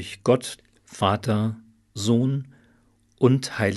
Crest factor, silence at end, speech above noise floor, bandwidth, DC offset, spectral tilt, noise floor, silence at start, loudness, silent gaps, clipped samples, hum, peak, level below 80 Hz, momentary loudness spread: 20 dB; 0 s; 38 dB; 12 kHz; under 0.1%; -6 dB/octave; -61 dBFS; 0 s; -23 LUFS; none; under 0.1%; none; -4 dBFS; -62 dBFS; 20 LU